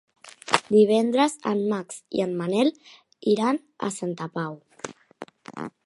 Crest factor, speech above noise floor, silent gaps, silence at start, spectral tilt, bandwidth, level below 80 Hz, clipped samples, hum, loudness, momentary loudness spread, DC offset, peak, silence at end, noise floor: 24 dB; 21 dB; none; 0.25 s; -5 dB/octave; 11.5 kHz; -72 dBFS; under 0.1%; none; -24 LUFS; 20 LU; under 0.1%; 0 dBFS; 0.15 s; -45 dBFS